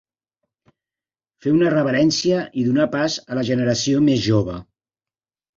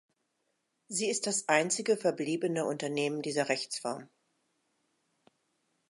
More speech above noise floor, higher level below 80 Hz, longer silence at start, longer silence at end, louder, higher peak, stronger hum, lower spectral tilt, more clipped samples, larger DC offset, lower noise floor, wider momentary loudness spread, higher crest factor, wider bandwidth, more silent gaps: first, over 72 dB vs 48 dB; first, -52 dBFS vs -86 dBFS; first, 1.45 s vs 0.9 s; second, 0.95 s vs 1.85 s; first, -19 LUFS vs -31 LUFS; first, -6 dBFS vs -10 dBFS; neither; first, -5.5 dB/octave vs -3 dB/octave; neither; neither; first, under -90 dBFS vs -80 dBFS; second, 6 LU vs 9 LU; second, 16 dB vs 24 dB; second, 7.8 kHz vs 11.5 kHz; neither